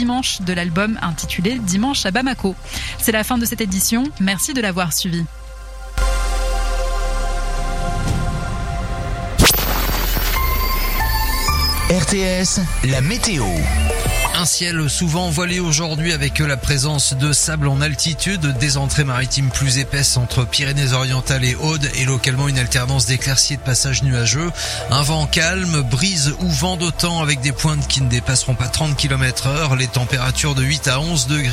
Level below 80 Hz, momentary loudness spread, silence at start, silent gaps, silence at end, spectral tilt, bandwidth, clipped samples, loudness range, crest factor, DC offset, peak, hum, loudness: -26 dBFS; 7 LU; 0 s; none; 0 s; -3.5 dB/octave; 16 kHz; under 0.1%; 3 LU; 18 dB; under 0.1%; 0 dBFS; none; -18 LUFS